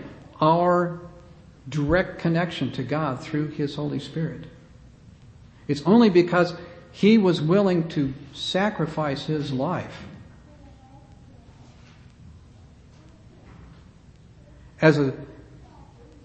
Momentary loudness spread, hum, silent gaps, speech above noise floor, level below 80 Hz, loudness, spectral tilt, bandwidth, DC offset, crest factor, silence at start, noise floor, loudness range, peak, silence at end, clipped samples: 22 LU; none; none; 28 dB; -50 dBFS; -23 LUFS; -7 dB/octave; 8.6 kHz; under 0.1%; 22 dB; 0 s; -50 dBFS; 10 LU; -2 dBFS; 0.4 s; under 0.1%